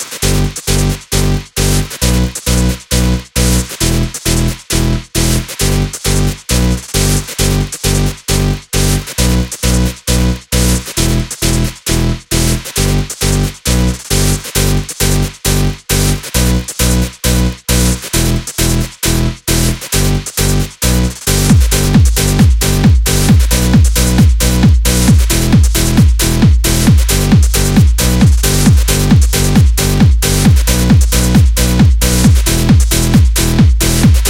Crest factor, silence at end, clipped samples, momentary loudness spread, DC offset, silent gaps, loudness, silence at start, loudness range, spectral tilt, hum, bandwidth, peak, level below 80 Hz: 10 dB; 0 s; under 0.1%; 5 LU; under 0.1%; none; -12 LUFS; 0 s; 4 LU; -4.5 dB/octave; none; 17 kHz; 0 dBFS; -14 dBFS